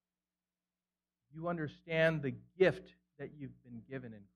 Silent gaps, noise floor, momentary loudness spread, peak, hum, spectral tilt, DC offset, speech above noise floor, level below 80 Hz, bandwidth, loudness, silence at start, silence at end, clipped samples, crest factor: none; under -90 dBFS; 19 LU; -16 dBFS; none; -7.5 dB/octave; under 0.1%; over 53 dB; -70 dBFS; 10.5 kHz; -35 LUFS; 1.35 s; 0.15 s; under 0.1%; 22 dB